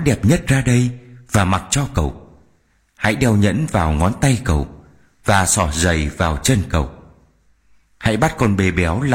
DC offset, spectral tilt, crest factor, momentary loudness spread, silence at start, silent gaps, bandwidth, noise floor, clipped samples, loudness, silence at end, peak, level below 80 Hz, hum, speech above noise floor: under 0.1%; -5 dB/octave; 16 dB; 7 LU; 0 s; none; 16.5 kHz; -59 dBFS; under 0.1%; -17 LUFS; 0 s; -2 dBFS; -30 dBFS; none; 42 dB